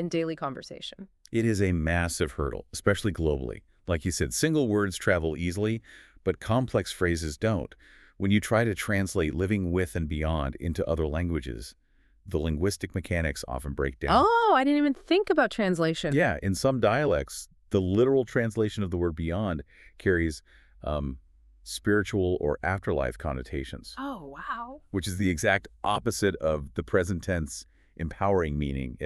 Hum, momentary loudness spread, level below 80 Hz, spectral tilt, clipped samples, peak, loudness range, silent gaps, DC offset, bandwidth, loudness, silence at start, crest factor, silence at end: none; 13 LU; -42 dBFS; -5.5 dB/octave; under 0.1%; -8 dBFS; 6 LU; none; under 0.1%; 13.5 kHz; -28 LUFS; 0 s; 20 dB; 0 s